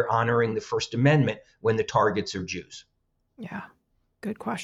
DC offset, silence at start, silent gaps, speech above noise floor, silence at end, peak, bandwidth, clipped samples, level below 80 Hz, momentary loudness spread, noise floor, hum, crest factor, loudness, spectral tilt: under 0.1%; 0 s; none; 47 dB; 0 s; -10 dBFS; 10 kHz; under 0.1%; -60 dBFS; 17 LU; -73 dBFS; none; 18 dB; -25 LUFS; -6 dB/octave